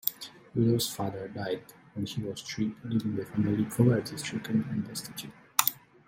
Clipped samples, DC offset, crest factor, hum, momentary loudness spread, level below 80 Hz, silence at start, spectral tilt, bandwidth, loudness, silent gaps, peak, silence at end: under 0.1%; under 0.1%; 28 dB; none; 12 LU; -64 dBFS; 0.05 s; -5 dB/octave; 16.5 kHz; -30 LUFS; none; -2 dBFS; 0.3 s